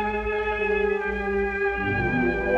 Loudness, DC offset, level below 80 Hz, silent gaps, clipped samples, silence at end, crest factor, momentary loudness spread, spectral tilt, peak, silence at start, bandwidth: -25 LUFS; under 0.1%; -38 dBFS; none; under 0.1%; 0 s; 12 dB; 3 LU; -7.5 dB/octave; -12 dBFS; 0 s; 7 kHz